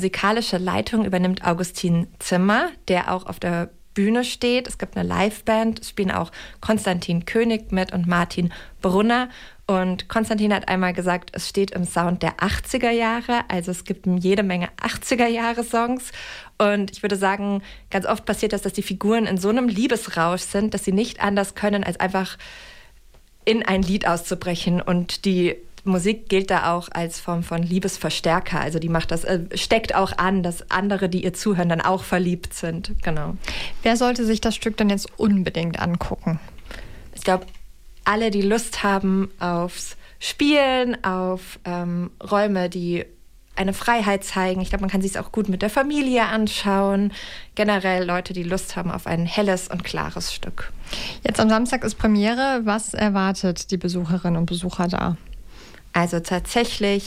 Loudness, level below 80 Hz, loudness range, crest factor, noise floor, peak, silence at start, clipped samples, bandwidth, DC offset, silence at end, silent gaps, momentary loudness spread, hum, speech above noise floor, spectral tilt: -22 LUFS; -40 dBFS; 2 LU; 16 dB; -49 dBFS; -6 dBFS; 0 s; under 0.1%; 16 kHz; under 0.1%; 0 s; none; 8 LU; none; 28 dB; -5 dB/octave